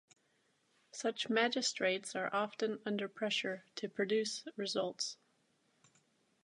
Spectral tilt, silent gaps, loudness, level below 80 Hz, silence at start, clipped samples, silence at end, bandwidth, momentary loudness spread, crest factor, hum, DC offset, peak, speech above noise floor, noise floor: -2.5 dB/octave; none; -37 LUFS; under -90 dBFS; 0.95 s; under 0.1%; 1.3 s; 11.5 kHz; 8 LU; 22 dB; none; under 0.1%; -16 dBFS; 39 dB; -76 dBFS